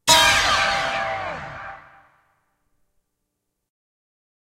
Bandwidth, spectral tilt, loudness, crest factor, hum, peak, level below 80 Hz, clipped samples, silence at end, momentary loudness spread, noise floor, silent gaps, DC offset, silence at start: 16 kHz; -0.5 dB/octave; -18 LUFS; 24 dB; none; 0 dBFS; -48 dBFS; under 0.1%; 2.7 s; 22 LU; -78 dBFS; none; under 0.1%; 0.05 s